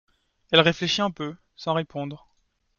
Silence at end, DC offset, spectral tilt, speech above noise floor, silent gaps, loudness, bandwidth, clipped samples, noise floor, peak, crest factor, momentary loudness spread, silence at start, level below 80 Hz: 0.6 s; under 0.1%; -4.5 dB/octave; 46 dB; none; -23 LUFS; 7.2 kHz; under 0.1%; -70 dBFS; -2 dBFS; 24 dB; 16 LU; 0.5 s; -60 dBFS